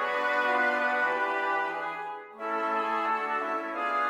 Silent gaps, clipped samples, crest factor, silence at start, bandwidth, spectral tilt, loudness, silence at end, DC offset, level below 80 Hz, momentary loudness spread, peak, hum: none; under 0.1%; 14 dB; 0 s; 15.5 kHz; -3 dB/octave; -28 LUFS; 0 s; under 0.1%; -78 dBFS; 9 LU; -14 dBFS; none